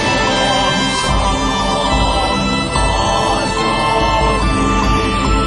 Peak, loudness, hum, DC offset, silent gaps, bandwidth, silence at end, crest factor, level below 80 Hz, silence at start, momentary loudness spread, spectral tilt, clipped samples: -2 dBFS; -14 LUFS; none; under 0.1%; none; 11.5 kHz; 0 s; 12 dB; -22 dBFS; 0 s; 2 LU; -4 dB/octave; under 0.1%